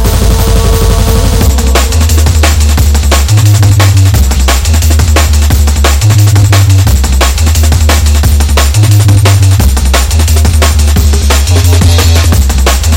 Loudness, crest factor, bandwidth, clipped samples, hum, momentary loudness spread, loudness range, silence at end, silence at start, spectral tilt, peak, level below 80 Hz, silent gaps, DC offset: -7 LUFS; 4 dB; 17 kHz; 1%; none; 3 LU; 1 LU; 0 s; 0 s; -4.5 dB/octave; 0 dBFS; -8 dBFS; none; under 0.1%